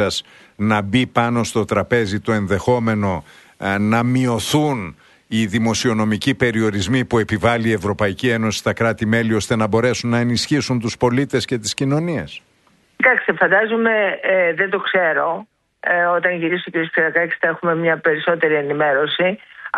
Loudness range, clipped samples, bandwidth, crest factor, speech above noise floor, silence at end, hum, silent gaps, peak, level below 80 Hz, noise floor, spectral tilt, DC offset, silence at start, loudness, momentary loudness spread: 2 LU; under 0.1%; 12 kHz; 18 dB; 39 dB; 0 s; none; none; 0 dBFS; -50 dBFS; -57 dBFS; -5 dB/octave; under 0.1%; 0 s; -18 LUFS; 5 LU